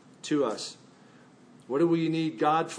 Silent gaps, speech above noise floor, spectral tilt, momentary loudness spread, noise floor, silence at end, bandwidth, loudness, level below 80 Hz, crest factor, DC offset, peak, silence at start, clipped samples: none; 28 dB; -5.5 dB/octave; 10 LU; -55 dBFS; 0 s; 10.5 kHz; -28 LUFS; -82 dBFS; 16 dB; under 0.1%; -14 dBFS; 0.25 s; under 0.1%